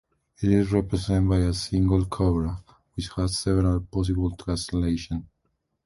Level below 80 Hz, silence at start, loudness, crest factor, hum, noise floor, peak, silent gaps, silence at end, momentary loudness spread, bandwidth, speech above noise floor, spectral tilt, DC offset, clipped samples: -34 dBFS; 0.4 s; -25 LUFS; 16 dB; none; -75 dBFS; -8 dBFS; none; 0.6 s; 11 LU; 11.5 kHz; 51 dB; -6.5 dB/octave; under 0.1%; under 0.1%